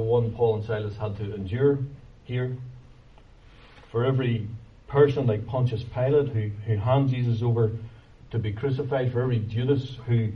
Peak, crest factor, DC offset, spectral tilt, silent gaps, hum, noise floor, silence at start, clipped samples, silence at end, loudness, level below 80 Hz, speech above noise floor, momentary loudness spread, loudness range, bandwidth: -6 dBFS; 18 dB; under 0.1%; -9.5 dB/octave; none; none; -51 dBFS; 0 s; under 0.1%; 0 s; -26 LUFS; -50 dBFS; 26 dB; 11 LU; 6 LU; 5.8 kHz